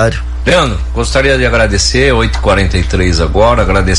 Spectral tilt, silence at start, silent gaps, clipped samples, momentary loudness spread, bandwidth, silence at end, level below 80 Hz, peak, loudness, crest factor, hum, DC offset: -4.5 dB/octave; 0 s; none; under 0.1%; 5 LU; 11.5 kHz; 0 s; -16 dBFS; 0 dBFS; -10 LUFS; 10 dB; none; under 0.1%